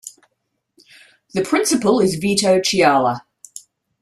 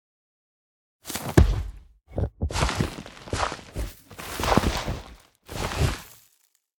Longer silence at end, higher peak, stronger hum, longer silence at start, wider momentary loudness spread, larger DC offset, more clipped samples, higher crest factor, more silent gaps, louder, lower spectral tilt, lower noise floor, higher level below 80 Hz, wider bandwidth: second, 0.45 s vs 0.7 s; about the same, -2 dBFS vs 0 dBFS; neither; second, 0.05 s vs 1.05 s; first, 23 LU vs 18 LU; neither; neither; second, 16 dB vs 28 dB; neither; first, -17 LUFS vs -27 LUFS; about the same, -4 dB/octave vs -5 dB/octave; first, -73 dBFS vs -67 dBFS; second, -58 dBFS vs -34 dBFS; second, 14 kHz vs over 20 kHz